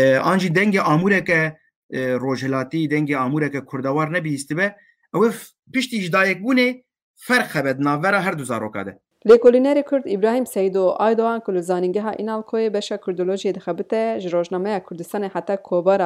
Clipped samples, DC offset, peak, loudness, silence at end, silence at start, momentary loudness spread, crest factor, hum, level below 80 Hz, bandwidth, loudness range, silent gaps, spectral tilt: under 0.1%; under 0.1%; -4 dBFS; -20 LUFS; 0 s; 0 s; 9 LU; 16 dB; none; -64 dBFS; 16 kHz; 5 LU; 1.76-1.89 s, 5.59-5.63 s, 7.02-7.14 s; -6 dB/octave